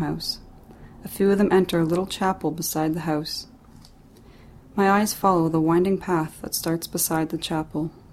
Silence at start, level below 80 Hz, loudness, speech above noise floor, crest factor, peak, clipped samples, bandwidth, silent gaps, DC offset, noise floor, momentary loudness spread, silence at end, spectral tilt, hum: 0 s; -50 dBFS; -23 LUFS; 26 dB; 18 dB; -6 dBFS; under 0.1%; 16.5 kHz; none; under 0.1%; -49 dBFS; 11 LU; 0 s; -5 dB/octave; none